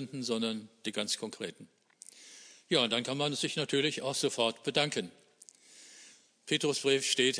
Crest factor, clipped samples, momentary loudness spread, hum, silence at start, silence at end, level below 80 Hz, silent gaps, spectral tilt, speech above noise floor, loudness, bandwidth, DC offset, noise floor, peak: 22 dB; under 0.1%; 23 LU; none; 0 s; 0 s; -82 dBFS; none; -3 dB/octave; 27 dB; -32 LUFS; 11 kHz; under 0.1%; -59 dBFS; -12 dBFS